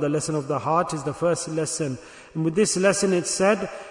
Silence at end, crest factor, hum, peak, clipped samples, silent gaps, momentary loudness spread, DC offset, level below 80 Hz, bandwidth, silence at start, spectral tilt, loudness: 0 s; 16 dB; none; -8 dBFS; under 0.1%; none; 8 LU; under 0.1%; -60 dBFS; 11 kHz; 0 s; -4.5 dB/octave; -23 LUFS